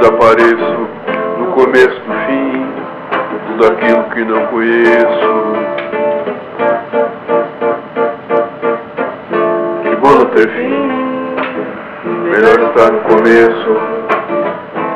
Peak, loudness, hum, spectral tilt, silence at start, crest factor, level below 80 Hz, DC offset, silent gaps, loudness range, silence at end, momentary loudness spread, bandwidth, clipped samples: 0 dBFS; -12 LUFS; none; -6.5 dB/octave; 0 s; 12 dB; -50 dBFS; under 0.1%; none; 5 LU; 0 s; 11 LU; 9.2 kHz; 0.3%